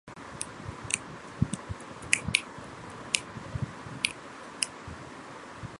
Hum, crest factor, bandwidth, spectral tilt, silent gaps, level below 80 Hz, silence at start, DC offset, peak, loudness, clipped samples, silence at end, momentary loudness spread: none; 36 dB; 16 kHz; -2.5 dB/octave; none; -52 dBFS; 0.05 s; under 0.1%; 0 dBFS; -33 LUFS; under 0.1%; 0 s; 15 LU